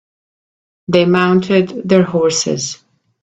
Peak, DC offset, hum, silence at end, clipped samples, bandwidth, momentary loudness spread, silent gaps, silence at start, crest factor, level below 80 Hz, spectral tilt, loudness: 0 dBFS; under 0.1%; none; 0.5 s; under 0.1%; 8.4 kHz; 11 LU; none; 0.9 s; 16 dB; -54 dBFS; -5 dB/octave; -14 LUFS